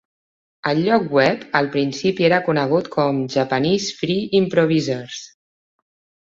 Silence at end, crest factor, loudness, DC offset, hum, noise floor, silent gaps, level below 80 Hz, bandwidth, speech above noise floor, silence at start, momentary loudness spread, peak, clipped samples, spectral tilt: 0.95 s; 18 dB; -19 LUFS; under 0.1%; none; under -90 dBFS; none; -58 dBFS; 7.8 kHz; over 71 dB; 0.65 s; 6 LU; -2 dBFS; under 0.1%; -5.5 dB/octave